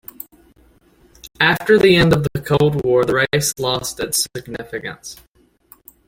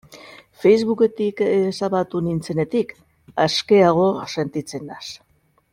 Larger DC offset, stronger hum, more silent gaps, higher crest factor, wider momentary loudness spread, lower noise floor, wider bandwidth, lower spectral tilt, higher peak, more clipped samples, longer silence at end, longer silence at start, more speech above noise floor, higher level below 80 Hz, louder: neither; neither; neither; about the same, 18 dB vs 18 dB; first, 21 LU vs 16 LU; first, -53 dBFS vs -44 dBFS; first, 17 kHz vs 12 kHz; second, -4.5 dB/octave vs -6 dB/octave; about the same, -2 dBFS vs -4 dBFS; neither; first, 0.95 s vs 0.55 s; first, 1.25 s vs 0.1 s; first, 36 dB vs 25 dB; first, -44 dBFS vs -58 dBFS; first, -16 LUFS vs -20 LUFS